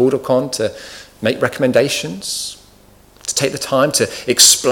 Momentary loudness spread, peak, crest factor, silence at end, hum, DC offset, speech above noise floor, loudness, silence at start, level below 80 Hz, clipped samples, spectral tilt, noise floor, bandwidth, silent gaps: 15 LU; 0 dBFS; 16 dB; 0 s; 50 Hz at -50 dBFS; under 0.1%; 31 dB; -15 LUFS; 0 s; -52 dBFS; under 0.1%; -2.5 dB/octave; -47 dBFS; over 20 kHz; none